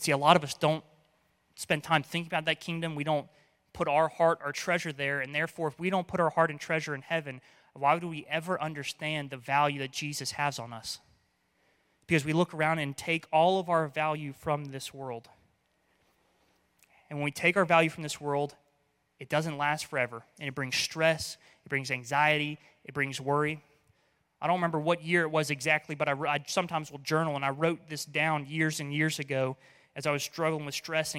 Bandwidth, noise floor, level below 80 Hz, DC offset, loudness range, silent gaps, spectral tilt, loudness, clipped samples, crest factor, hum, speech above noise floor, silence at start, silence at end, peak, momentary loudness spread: 16.5 kHz; -73 dBFS; -70 dBFS; under 0.1%; 3 LU; none; -4.5 dB/octave; -30 LUFS; under 0.1%; 26 dB; none; 43 dB; 0 s; 0 s; -6 dBFS; 11 LU